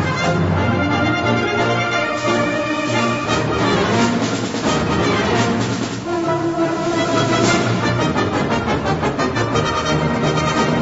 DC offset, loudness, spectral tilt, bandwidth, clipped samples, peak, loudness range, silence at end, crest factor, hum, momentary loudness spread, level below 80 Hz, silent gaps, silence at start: under 0.1%; -18 LUFS; -5 dB/octave; 8 kHz; under 0.1%; -4 dBFS; 1 LU; 0 s; 14 dB; none; 3 LU; -40 dBFS; none; 0 s